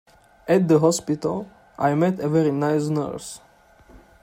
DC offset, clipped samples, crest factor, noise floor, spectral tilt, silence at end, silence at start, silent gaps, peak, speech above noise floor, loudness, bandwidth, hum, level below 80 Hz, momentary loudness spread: under 0.1%; under 0.1%; 18 dB; -51 dBFS; -6.5 dB/octave; 0.25 s; 0.45 s; none; -6 dBFS; 30 dB; -22 LUFS; 16 kHz; none; -58 dBFS; 19 LU